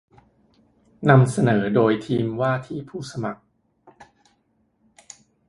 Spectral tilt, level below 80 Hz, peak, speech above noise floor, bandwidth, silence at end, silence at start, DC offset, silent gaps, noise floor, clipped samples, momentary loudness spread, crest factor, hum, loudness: -7.5 dB/octave; -58 dBFS; 0 dBFS; 47 dB; 11.5 kHz; 2.15 s; 1 s; under 0.1%; none; -67 dBFS; under 0.1%; 17 LU; 24 dB; none; -21 LUFS